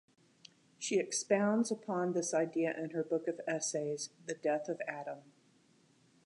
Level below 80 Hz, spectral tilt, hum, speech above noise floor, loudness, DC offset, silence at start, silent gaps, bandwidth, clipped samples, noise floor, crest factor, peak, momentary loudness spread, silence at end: -90 dBFS; -4 dB/octave; none; 33 dB; -35 LUFS; under 0.1%; 0.8 s; none; 11 kHz; under 0.1%; -68 dBFS; 20 dB; -16 dBFS; 10 LU; 1.05 s